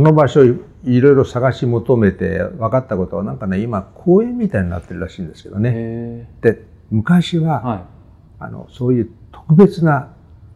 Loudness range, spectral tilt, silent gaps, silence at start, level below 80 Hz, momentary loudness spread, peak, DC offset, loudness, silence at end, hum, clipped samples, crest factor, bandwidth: 4 LU; -9 dB/octave; none; 0 s; -46 dBFS; 16 LU; 0 dBFS; under 0.1%; -16 LUFS; 0.45 s; none; under 0.1%; 16 dB; 10 kHz